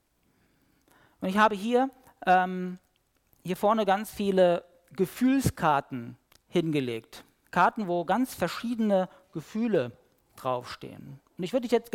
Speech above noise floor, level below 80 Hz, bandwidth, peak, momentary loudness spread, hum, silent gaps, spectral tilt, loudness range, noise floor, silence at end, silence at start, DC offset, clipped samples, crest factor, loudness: 42 dB; -58 dBFS; 17 kHz; -10 dBFS; 16 LU; none; none; -6 dB/octave; 3 LU; -69 dBFS; 0.05 s; 1.2 s; under 0.1%; under 0.1%; 18 dB; -28 LUFS